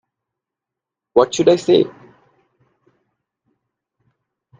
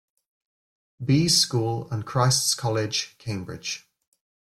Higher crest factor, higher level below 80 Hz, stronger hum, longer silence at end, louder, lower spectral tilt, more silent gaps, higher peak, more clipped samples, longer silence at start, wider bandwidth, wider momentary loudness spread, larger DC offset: about the same, 20 dB vs 20 dB; about the same, -62 dBFS vs -58 dBFS; neither; first, 2.7 s vs 0.7 s; first, -16 LUFS vs -23 LUFS; about the same, -5 dB/octave vs -4 dB/octave; neither; first, 0 dBFS vs -6 dBFS; neither; first, 1.15 s vs 1 s; second, 9.4 kHz vs 15.5 kHz; second, 5 LU vs 14 LU; neither